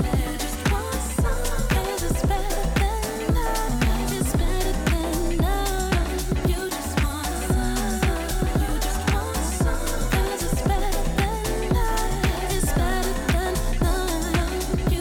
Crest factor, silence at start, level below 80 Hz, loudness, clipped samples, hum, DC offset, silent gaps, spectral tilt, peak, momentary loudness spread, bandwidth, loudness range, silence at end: 12 dB; 0 s; -26 dBFS; -25 LUFS; under 0.1%; none; under 0.1%; none; -5 dB/octave; -10 dBFS; 2 LU; 18 kHz; 1 LU; 0 s